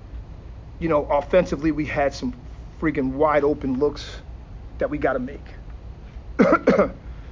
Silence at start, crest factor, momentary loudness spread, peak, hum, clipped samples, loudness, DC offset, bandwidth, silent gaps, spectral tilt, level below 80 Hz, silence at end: 0 s; 18 dB; 22 LU; -4 dBFS; none; under 0.1%; -22 LUFS; under 0.1%; 7.6 kHz; none; -7 dB/octave; -38 dBFS; 0 s